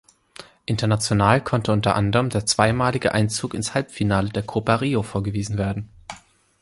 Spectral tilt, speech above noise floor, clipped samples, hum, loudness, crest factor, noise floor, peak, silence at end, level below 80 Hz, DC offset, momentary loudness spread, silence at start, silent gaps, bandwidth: -5 dB/octave; 26 dB; under 0.1%; none; -22 LUFS; 20 dB; -47 dBFS; -2 dBFS; 0.45 s; -44 dBFS; under 0.1%; 10 LU; 0.4 s; none; 11.5 kHz